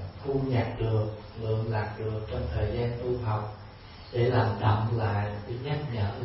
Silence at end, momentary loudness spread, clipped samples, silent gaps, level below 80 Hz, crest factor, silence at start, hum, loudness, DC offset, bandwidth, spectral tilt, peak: 0 s; 10 LU; under 0.1%; none; -44 dBFS; 16 dB; 0 s; none; -30 LUFS; under 0.1%; 5.8 kHz; -11.5 dB/octave; -12 dBFS